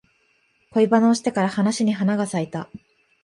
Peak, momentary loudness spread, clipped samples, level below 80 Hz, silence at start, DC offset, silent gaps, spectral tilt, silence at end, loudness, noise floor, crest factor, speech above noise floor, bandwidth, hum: -6 dBFS; 13 LU; under 0.1%; -66 dBFS; 0.75 s; under 0.1%; none; -6 dB/octave; 0.45 s; -21 LUFS; -64 dBFS; 16 dB; 44 dB; 11.5 kHz; none